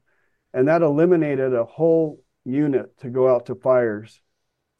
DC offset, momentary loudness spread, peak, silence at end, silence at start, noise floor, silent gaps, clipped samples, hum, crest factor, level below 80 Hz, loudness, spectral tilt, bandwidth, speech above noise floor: under 0.1%; 10 LU; -6 dBFS; 0.75 s; 0.55 s; -75 dBFS; none; under 0.1%; none; 14 dB; -68 dBFS; -20 LUFS; -10 dB/octave; 6.4 kHz; 56 dB